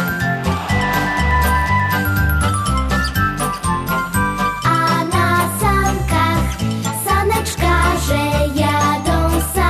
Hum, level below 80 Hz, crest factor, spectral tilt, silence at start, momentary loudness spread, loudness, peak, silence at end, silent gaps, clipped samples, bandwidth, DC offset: none; -24 dBFS; 12 dB; -5 dB/octave; 0 s; 4 LU; -17 LUFS; -4 dBFS; 0 s; none; under 0.1%; 14 kHz; under 0.1%